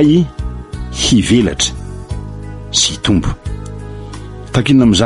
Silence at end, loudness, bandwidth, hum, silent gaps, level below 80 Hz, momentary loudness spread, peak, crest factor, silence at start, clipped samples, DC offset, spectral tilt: 0 s; -14 LUFS; 11.5 kHz; none; none; -28 dBFS; 18 LU; 0 dBFS; 14 dB; 0 s; under 0.1%; under 0.1%; -4.5 dB/octave